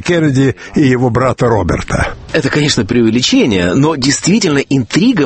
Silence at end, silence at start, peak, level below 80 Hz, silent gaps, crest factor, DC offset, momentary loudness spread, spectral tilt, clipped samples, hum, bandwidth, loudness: 0 s; 0 s; 0 dBFS; -32 dBFS; none; 12 dB; under 0.1%; 5 LU; -5 dB/octave; under 0.1%; none; 8.8 kHz; -12 LUFS